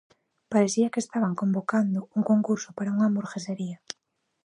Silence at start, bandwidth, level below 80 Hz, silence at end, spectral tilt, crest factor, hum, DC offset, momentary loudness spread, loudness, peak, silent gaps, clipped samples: 0.5 s; 10.5 kHz; -76 dBFS; 0.7 s; -6 dB/octave; 18 dB; none; under 0.1%; 11 LU; -26 LUFS; -8 dBFS; none; under 0.1%